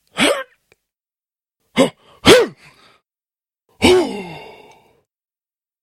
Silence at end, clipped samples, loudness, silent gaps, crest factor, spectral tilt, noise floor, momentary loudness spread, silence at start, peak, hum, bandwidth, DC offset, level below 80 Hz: 1.4 s; under 0.1%; -15 LUFS; none; 20 dB; -3.5 dB/octave; under -90 dBFS; 21 LU; 0.15 s; 0 dBFS; none; 16.5 kHz; under 0.1%; -46 dBFS